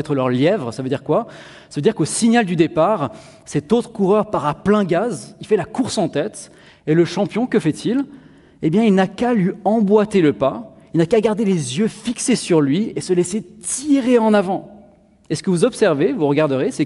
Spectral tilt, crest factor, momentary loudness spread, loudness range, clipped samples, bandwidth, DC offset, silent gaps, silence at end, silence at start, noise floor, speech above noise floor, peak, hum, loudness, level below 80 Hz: -5.5 dB/octave; 16 dB; 9 LU; 3 LU; under 0.1%; 11.5 kHz; under 0.1%; none; 0 s; 0 s; -49 dBFS; 32 dB; -2 dBFS; none; -18 LUFS; -54 dBFS